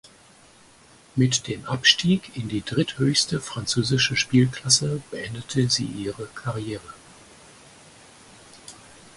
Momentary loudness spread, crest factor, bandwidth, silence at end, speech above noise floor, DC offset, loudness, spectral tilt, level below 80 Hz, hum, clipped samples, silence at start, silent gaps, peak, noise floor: 15 LU; 24 dB; 11.5 kHz; 0.4 s; 29 dB; under 0.1%; -23 LUFS; -3.5 dB/octave; -54 dBFS; none; under 0.1%; 1.15 s; none; -2 dBFS; -53 dBFS